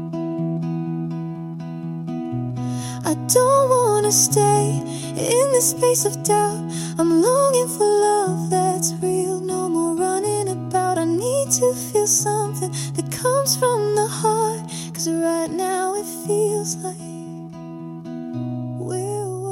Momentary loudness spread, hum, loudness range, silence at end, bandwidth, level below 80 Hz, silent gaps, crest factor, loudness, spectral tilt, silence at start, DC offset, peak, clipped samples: 13 LU; none; 7 LU; 0 s; 16.5 kHz; -60 dBFS; none; 20 dB; -20 LUFS; -4.5 dB/octave; 0 s; under 0.1%; -2 dBFS; under 0.1%